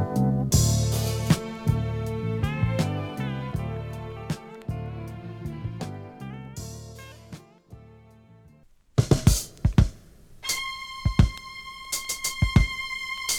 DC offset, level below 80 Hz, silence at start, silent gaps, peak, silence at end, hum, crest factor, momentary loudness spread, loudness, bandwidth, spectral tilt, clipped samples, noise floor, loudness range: under 0.1%; -34 dBFS; 0 s; none; -4 dBFS; 0 s; none; 22 dB; 16 LU; -27 LUFS; 19.5 kHz; -5 dB/octave; under 0.1%; -56 dBFS; 13 LU